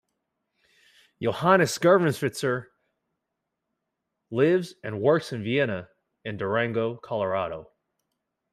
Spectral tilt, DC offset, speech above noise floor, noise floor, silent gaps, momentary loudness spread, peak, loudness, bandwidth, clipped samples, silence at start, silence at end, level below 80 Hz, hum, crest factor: -5.5 dB/octave; under 0.1%; 58 dB; -83 dBFS; none; 14 LU; -6 dBFS; -25 LUFS; 15.5 kHz; under 0.1%; 1.2 s; 0.9 s; -68 dBFS; none; 22 dB